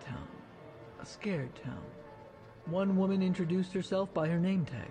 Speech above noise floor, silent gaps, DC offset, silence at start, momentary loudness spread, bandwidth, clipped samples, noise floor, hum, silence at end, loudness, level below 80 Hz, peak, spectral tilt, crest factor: 20 dB; none; under 0.1%; 0 s; 21 LU; 9.2 kHz; under 0.1%; -53 dBFS; none; 0 s; -33 LUFS; -62 dBFS; -20 dBFS; -8 dB/octave; 14 dB